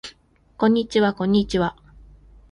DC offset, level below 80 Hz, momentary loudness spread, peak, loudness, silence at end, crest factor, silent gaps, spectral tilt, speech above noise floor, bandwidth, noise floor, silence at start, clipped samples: under 0.1%; -46 dBFS; 7 LU; -6 dBFS; -21 LUFS; 0.8 s; 18 dB; none; -6.5 dB/octave; 35 dB; 11 kHz; -54 dBFS; 0.05 s; under 0.1%